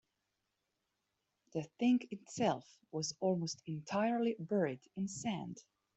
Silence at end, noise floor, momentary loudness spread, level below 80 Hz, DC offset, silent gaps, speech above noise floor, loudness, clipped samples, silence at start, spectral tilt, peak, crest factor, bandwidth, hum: 0.35 s; -86 dBFS; 11 LU; -78 dBFS; under 0.1%; none; 49 dB; -38 LUFS; under 0.1%; 1.55 s; -5.5 dB/octave; -20 dBFS; 18 dB; 8.2 kHz; none